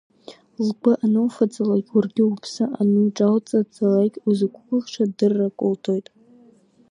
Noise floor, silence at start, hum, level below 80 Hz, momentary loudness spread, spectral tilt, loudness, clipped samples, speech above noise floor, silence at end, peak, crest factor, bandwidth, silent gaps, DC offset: -54 dBFS; 0.3 s; none; -72 dBFS; 7 LU; -7.5 dB/octave; -21 LUFS; under 0.1%; 34 dB; 0.9 s; -4 dBFS; 16 dB; 10.5 kHz; none; under 0.1%